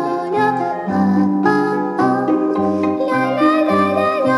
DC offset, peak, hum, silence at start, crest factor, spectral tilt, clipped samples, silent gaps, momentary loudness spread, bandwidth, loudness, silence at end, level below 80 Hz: under 0.1%; -2 dBFS; none; 0 s; 14 dB; -7.5 dB/octave; under 0.1%; none; 3 LU; 12 kHz; -16 LUFS; 0 s; -60 dBFS